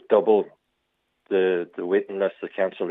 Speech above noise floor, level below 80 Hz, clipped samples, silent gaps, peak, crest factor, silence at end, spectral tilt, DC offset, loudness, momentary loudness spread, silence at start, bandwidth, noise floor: 52 dB; -84 dBFS; under 0.1%; none; -6 dBFS; 18 dB; 0 s; -8.5 dB/octave; under 0.1%; -24 LUFS; 8 LU; 0.1 s; 3.9 kHz; -75 dBFS